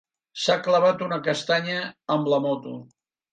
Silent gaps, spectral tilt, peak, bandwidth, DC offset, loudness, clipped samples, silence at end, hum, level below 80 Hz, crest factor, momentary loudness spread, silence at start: none; -4.5 dB/octave; -8 dBFS; 9.2 kHz; under 0.1%; -24 LUFS; under 0.1%; 0.5 s; none; -74 dBFS; 16 dB; 13 LU; 0.35 s